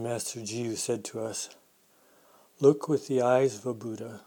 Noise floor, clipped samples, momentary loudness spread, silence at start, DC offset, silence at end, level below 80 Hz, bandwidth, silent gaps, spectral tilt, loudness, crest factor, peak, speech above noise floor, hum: -63 dBFS; under 0.1%; 13 LU; 0 s; under 0.1%; 0.05 s; -78 dBFS; 19 kHz; none; -5 dB/octave; -29 LUFS; 22 dB; -8 dBFS; 35 dB; none